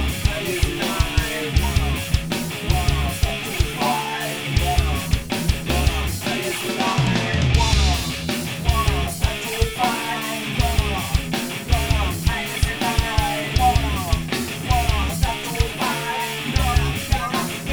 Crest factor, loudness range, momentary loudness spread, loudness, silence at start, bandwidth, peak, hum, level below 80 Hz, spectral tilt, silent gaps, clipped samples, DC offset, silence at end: 18 dB; 2 LU; 5 LU; -22 LUFS; 0 s; over 20 kHz; -4 dBFS; none; -26 dBFS; -4.5 dB/octave; none; under 0.1%; under 0.1%; 0 s